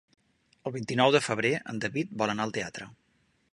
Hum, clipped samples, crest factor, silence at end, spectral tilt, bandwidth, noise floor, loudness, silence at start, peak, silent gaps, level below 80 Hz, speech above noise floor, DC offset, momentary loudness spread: none; under 0.1%; 24 dB; 0.6 s; -4.5 dB/octave; 11.5 kHz; -70 dBFS; -28 LUFS; 0.65 s; -6 dBFS; none; -68 dBFS; 42 dB; under 0.1%; 16 LU